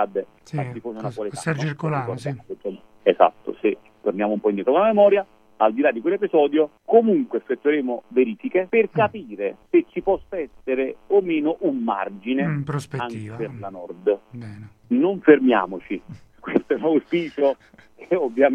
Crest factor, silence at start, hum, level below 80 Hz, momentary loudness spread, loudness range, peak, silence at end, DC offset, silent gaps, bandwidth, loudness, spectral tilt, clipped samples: 20 dB; 0 s; none; -60 dBFS; 14 LU; 5 LU; 0 dBFS; 0 s; under 0.1%; none; 10.5 kHz; -22 LUFS; -7.5 dB/octave; under 0.1%